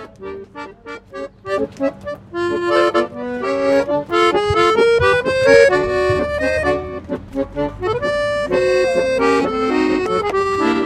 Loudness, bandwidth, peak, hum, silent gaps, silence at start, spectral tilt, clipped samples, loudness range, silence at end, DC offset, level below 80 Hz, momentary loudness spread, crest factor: -17 LUFS; 12.5 kHz; 0 dBFS; none; none; 0 s; -5 dB/octave; under 0.1%; 6 LU; 0 s; under 0.1%; -42 dBFS; 17 LU; 16 dB